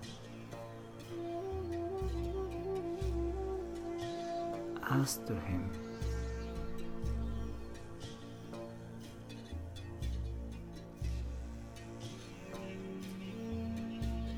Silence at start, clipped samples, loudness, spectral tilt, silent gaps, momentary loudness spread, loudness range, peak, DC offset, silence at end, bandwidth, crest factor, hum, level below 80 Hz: 0 s; under 0.1%; -42 LUFS; -6 dB/octave; none; 10 LU; 7 LU; -20 dBFS; under 0.1%; 0 s; 16 kHz; 20 dB; none; -46 dBFS